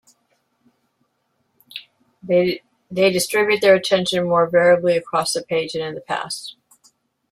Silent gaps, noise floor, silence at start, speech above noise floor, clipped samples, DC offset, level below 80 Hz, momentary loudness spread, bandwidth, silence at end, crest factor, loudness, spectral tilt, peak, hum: none; -69 dBFS; 1.75 s; 51 dB; under 0.1%; under 0.1%; -64 dBFS; 17 LU; 15 kHz; 0.8 s; 18 dB; -19 LUFS; -4 dB/octave; -2 dBFS; none